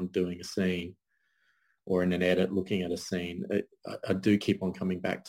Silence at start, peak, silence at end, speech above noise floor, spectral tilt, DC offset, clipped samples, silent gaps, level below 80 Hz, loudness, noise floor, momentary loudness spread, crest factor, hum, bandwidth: 0 s; -14 dBFS; 0 s; 43 dB; -6 dB/octave; under 0.1%; under 0.1%; none; -64 dBFS; -30 LUFS; -73 dBFS; 8 LU; 18 dB; none; 16 kHz